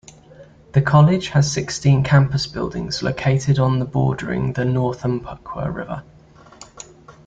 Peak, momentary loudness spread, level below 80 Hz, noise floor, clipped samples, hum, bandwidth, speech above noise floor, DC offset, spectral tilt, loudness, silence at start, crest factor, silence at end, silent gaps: -2 dBFS; 17 LU; -44 dBFS; -45 dBFS; under 0.1%; none; 8 kHz; 27 dB; under 0.1%; -6 dB/octave; -19 LUFS; 0.4 s; 18 dB; 0.15 s; none